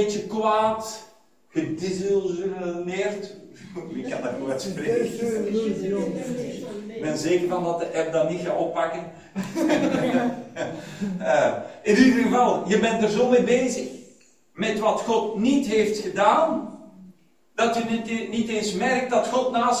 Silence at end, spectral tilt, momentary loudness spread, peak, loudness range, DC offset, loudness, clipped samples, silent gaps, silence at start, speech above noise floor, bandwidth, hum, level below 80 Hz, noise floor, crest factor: 0 s; -5 dB/octave; 13 LU; -4 dBFS; 7 LU; under 0.1%; -24 LUFS; under 0.1%; none; 0 s; 32 dB; 16 kHz; none; -60 dBFS; -55 dBFS; 18 dB